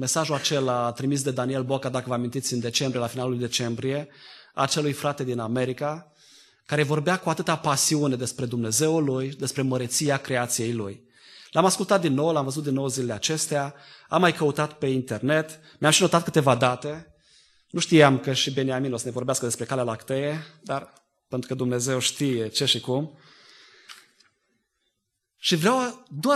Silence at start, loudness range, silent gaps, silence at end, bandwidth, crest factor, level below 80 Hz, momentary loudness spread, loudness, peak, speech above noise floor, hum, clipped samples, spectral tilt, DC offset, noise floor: 0 s; 5 LU; none; 0 s; 13 kHz; 24 dB; -66 dBFS; 10 LU; -24 LUFS; -2 dBFS; 54 dB; none; under 0.1%; -4 dB/octave; under 0.1%; -79 dBFS